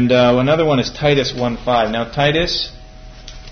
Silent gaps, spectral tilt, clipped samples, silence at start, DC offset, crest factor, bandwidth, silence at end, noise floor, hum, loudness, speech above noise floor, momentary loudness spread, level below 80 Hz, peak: none; -5.5 dB/octave; under 0.1%; 0 s; under 0.1%; 14 dB; 6.6 kHz; 0 s; -36 dBFS; none; -16 LUFS; 20 dB; 8 LU; -36 dBFS; -2 dBFS